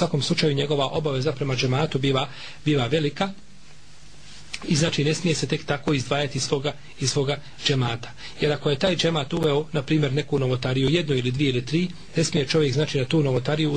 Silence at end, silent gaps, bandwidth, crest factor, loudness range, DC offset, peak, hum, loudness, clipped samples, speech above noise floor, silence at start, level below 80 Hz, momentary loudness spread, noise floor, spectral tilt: 0 s; none; 10 kHz; 16 dB; 3 LU; 1%; -6 dBFS; none; -24 LUFS; under 0.1%; 26 dB; 0 s; -50 dBFS; 5 LU; -50 dBFS; -5 dB/octave